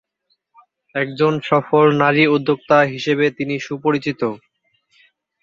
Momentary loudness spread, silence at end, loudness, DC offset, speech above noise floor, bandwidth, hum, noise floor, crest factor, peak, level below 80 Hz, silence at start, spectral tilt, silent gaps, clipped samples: 10 LU; 1.05 s; -17 LUFS; under 0.1%; 52 dB; 7.4 kHz; none; -69 dBFS; 18 dB; -2 dBFS; -62 dBFS; 0.95 s; -6.5 dB/octave; none; under 0.1%